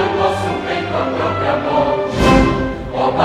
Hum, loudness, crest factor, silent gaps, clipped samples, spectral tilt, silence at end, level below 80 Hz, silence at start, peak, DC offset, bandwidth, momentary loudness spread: none; -16 LUFS; 16 dB; none; under 0.1%; -6 dB/octave; 0 s; -28 dBFS; 0 s; 0 dBFS; under 0.1%; 14 kHz; 7 LU